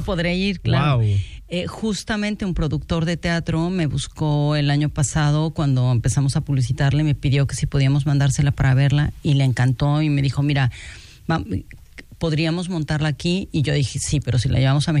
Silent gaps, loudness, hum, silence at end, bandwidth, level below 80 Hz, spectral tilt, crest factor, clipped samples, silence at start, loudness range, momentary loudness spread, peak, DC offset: none; -20 LUFS; none; 0 s; 11.5 kHz; -36 dBFS; -6 dB/octave; 12 dB; under 0.1%; 0 s; 4 LU; 6 LU; -6 dBFS; under 0.1%